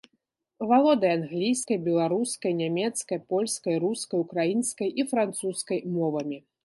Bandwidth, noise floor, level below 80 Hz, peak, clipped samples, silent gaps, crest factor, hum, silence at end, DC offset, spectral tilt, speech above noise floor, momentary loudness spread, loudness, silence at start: 12 kHz; -76 dBFS; -76 dBFS; -10 dBFS; under 0.1%; none; 18 dB; none; 0.25 s; under 0.1%; -5 dB/octave; 50 dB; 8 LU; -27 LUFS; 0.6 s